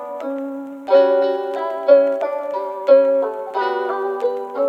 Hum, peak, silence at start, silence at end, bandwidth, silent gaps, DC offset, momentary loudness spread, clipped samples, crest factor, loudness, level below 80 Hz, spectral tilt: none; -2 dBFS; 0 s; 0 s; 5.6 kHz; none; under 0.1%; 12 LU; under 0.1%; 16 dB; -18 LUFS; -86 dBFS; -4.5 dB/octave